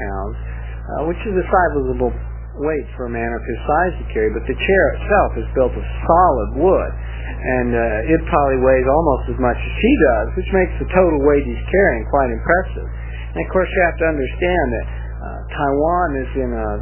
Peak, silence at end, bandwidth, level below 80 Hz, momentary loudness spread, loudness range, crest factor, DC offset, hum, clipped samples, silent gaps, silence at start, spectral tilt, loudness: 0 dBFS; 0 s; 3.2 kHz; -26 dBFS; 13 LU; 4 LU; 18 dB; under 0.1%; none; under 0.1%; none; 0 s; -11 dB/octave; -18 LUFS